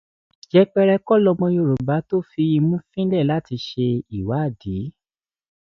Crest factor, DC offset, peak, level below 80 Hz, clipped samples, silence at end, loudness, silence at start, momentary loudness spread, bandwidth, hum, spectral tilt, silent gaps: 18 dB; under 0.1%; -4 dBFS; -50 dBFS; under 0.1%; 0.8 s; -20 LUFS; 0.55 s; 10 LU; 6.4 kHz; none; -9 dB/octave; none